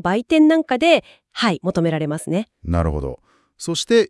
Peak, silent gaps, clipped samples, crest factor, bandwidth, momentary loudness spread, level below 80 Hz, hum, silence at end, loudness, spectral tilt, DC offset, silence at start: 0 dBFS; none; under 0.1%; 18 dB; 12 kHz; 12 LU; -38 dBFS; none; 0.05 s; -19 LUFS; -5.5 dB/octave; under 0.1%; 0.05 s